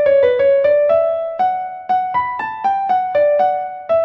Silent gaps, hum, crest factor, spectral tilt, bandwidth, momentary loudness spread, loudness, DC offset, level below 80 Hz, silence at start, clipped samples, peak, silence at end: none; none; 12 dB; -6 dB/octave; 5.6 kHz; 7 LU; -16 LUFS; under 0.1%; -56 dBFS; 0 s; under 0.1%; -2 dBFS; 0 s